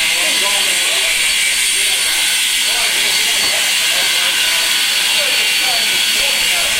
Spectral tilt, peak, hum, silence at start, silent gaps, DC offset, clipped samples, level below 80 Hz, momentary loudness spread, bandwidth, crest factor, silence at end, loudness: 2.5 dB/octave; 0 dBFS; none; 0 s; none; under 0.1%; under 0.1%; -46 dBFS; 0 LU; 16 kHz; 14 dB; 0 s; -12 LUFS